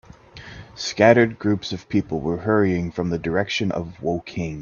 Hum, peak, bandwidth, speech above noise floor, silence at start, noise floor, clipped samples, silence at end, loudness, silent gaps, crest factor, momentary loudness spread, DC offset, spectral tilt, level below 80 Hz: none; 0 dBFS; 7.2 kHz; 21 dB; 0.35 s; -42 dBFS; under 0.1%; 0 s; -22 LUFS; none; 22 dB; 14 LU; under 0.1%; -6 dB/octave; -50 dBFS